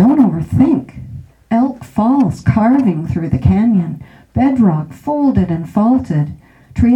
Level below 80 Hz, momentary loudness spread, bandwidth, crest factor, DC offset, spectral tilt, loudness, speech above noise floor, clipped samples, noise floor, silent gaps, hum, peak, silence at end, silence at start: -34 dBFS; 12 LU; 8.6 kHz; 14 dB; under 0.1%; -9.5 dB/octave; -14 LUFS; 19 dB; under 0.1%; -32 dBFS; none; none; 0 dBFS; 0 s; 0 s